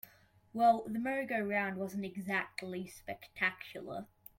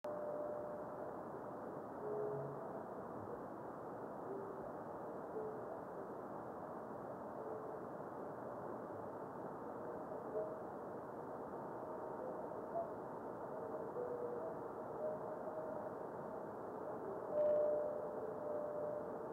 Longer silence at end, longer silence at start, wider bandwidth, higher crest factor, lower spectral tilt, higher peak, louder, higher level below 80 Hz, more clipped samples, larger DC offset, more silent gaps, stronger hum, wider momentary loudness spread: first, 0.35 s vs 0 s; about the same, 0.05 s vs 0.05 s; about the same, 16.5 kHz vs 16 kHz; about the same, 20 dB vs 18 dB; second, -5.5 dB/octave vs -8.5 dB/octave; first, -16 dBFS vs -28 dBFS; first, -35 LUFS vs -46 LUFS; first, -74 dBFS vs -80 dBFS; neither; neither; neither; neither; first, 17 LU vs 6 LU